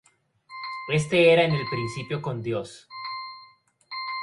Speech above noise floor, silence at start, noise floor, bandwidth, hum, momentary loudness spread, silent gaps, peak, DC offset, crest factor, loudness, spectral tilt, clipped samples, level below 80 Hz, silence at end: 32 dB; 0.5 s; -56 dBFS; 11.5 kHz; none; 21 LU; none; -8 dBFS; under 0.1%; 18 dB; -25 LUFS; -5.5 dB/octave; under 0.1%; -60 dBFS; 0 s